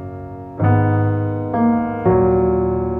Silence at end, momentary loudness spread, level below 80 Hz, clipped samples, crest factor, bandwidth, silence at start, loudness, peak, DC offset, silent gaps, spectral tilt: 0 s; 11 LU; -38 dBFS; under 0.1%; 14 dB; 3.2 kHz; 0 s; -17 LUFS; -4 dBFS; under 0.1%; none; -12.5 dB/octave